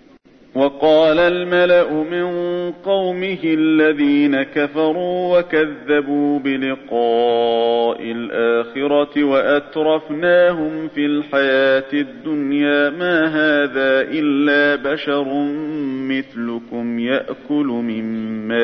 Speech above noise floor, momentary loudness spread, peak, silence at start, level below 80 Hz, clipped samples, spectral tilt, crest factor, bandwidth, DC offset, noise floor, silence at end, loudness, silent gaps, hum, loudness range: 31 dB; 9 LU; -4 dBFS; 0.55 s; -56 dBFS; under 0.1%; -7.5 dB/octave; 14 dB; 6 kHz; under 0.1%; -47 dBFS; 0 s; -17 LUFS; none; none; 3 LU